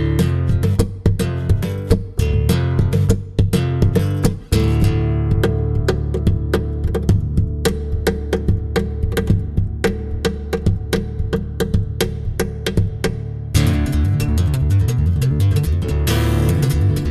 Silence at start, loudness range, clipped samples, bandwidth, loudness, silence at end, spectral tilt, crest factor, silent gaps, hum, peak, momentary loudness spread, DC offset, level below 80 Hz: 0 s; 4 LU; under 0.1%; 13.5 kHz; -19 LUFS; 0 s; -7 dB/octave; 16 dB; none; none; -2 dBFS; 5 LU; under 0.1%; -24 dBFS